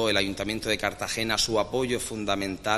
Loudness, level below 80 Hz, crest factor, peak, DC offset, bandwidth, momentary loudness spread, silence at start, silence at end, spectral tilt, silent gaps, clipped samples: -27 LUFS; -48 dBFS; 20 dB; -8 dBFS; under 0.1%; 15.5 kHz; 5 LU; 0 s; 0 s; -3 dB/octave; none; under 0.1%